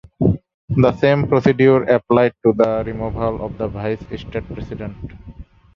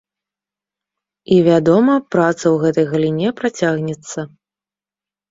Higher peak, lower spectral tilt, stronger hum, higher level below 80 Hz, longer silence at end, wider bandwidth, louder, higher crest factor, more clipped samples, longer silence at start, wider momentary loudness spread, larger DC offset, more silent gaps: about the same, -2 dBFS vs -2 dBFS; first, -9 dB/octave vs -6.5 dB/octave; second, none vs 50 Hz at -45 dBFS; first, -38 dBFS vs -58 dBFS; second, 0.35 s vs 1.05 s; second, 7 kHz vs 7.8 kHz; second, -18 LUFS vs -15 LUFS; about the same, 16 dB vs 16 dB; neither; second, 0.2 s vs 1.3 s; about the same, 16 LU vs 14 LU; neither; first, 0.54-0.68 s vs none